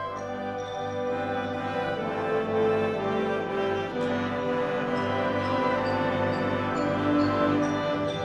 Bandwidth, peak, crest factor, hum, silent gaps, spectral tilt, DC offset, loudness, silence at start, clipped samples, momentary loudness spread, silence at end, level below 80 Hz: 11 kHz; -12 dBFS; 14 dB; 50 Hz at -50 dBFS; none; -6.5 dB/octave; under 0.1%; -27 LUFS; 0 s; under 0.1%; 6 LU; 0 s; -58 dBFS